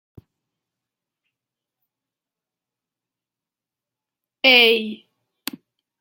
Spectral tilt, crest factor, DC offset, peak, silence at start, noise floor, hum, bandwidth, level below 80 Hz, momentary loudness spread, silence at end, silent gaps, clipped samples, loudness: -2 dB/octave; 26 dB; under 0.1%; 0 dBFS; 4.45 s; -89 dBFS; none; 16.5 kHz; -74 dBFS; 22 LU; 1.05 s; none; under 0.1%; -14 LUFS